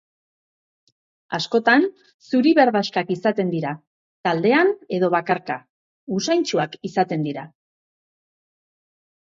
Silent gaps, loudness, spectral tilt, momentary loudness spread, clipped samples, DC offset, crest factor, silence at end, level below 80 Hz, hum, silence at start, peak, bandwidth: 2.14-2.19 s, 3.87-4.24 s, 5.70-6.07 s; -21 LUFS; -5.5 dB/octave; 12 LU; under 0.1%; under 0.1%; 20 dB; 1.9 s; -72 dBFS; none; 1.3 s; -2 dBFS; 7.8 kHz